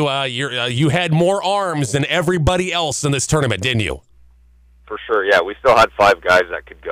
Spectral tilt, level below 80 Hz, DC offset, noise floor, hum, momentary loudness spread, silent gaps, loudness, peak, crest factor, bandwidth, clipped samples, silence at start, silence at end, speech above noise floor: -4.5 dB/octave; -38 dBFS; under 0.1%; -49 dBFS; none; 8 LU; none; -16 LUFS; -4 dBFS; 12 dB; 16 kHz; under 0.1%; 0 s; 0 s; 33 dB